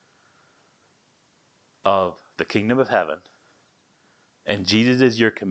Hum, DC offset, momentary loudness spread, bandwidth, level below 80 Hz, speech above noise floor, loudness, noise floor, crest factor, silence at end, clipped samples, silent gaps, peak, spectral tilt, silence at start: none; under 0.1%; 12 LU; 8.6 kHz; -58 dBFS; 40 dB; -16 LUFS; -55 dBFS; 18 dB; 0 s; under 0.1%; none; 0 dBFS; -5.5 dB/octave; 1.85 s